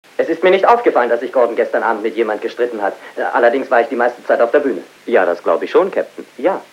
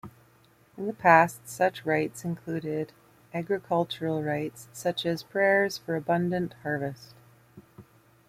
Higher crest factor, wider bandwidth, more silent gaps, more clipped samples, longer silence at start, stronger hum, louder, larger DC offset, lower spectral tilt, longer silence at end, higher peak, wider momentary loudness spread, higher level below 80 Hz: second, 16 dB vs 22 dB; second, 12.5 kHz vs 16 kHz; neither; neither; first, 0.2 s vs 0.05 s; neither; first, -15 LUFS vs -28 LUFS; neither; about the same, -5 dB/octave vs -5.5 dB/octave; second, 0.1 s vs 0.45 s; first, 0 dBFS vs -6 dBFS; second, 9 LU vs 15 LU; second, -76 dBFS vs -66 dBFS